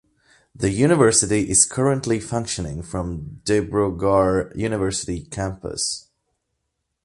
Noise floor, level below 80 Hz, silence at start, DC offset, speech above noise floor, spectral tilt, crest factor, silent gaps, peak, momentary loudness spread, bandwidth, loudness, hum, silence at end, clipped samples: -77 dBFS; -42 dBFS; 0.6 s; under 0.1%; 56 dB; -4 dB/octave; 20 dB; none; -2 dBFS; 13 LU; 11.5 kHz; -21 LUFS; none; 1.05 s; under 0.1%